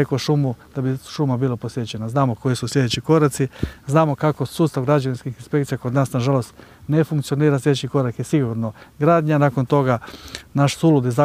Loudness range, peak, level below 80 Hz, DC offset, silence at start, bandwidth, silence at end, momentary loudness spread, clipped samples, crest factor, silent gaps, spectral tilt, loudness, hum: 2 LU; -2 dBFS; -48 dBFS; under 0.1%; 0 s; 15 kHz; 0 s; 9 LU; under 0.1%; 18 dB; none; -7 dB/octave; -20 LUFS; none